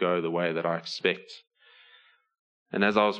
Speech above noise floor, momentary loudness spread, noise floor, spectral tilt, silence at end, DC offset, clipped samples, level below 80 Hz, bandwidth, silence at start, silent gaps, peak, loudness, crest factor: 33 dB; 15 LU; -60 dBFS; -5.5 dB/octave; 0 s; under 0.1%; under 0.1%; -76 dBFS; 9.6 kHz; 0 s; 2.39-2.66 s; -8 dBFS; -28 LUFS; 22 dB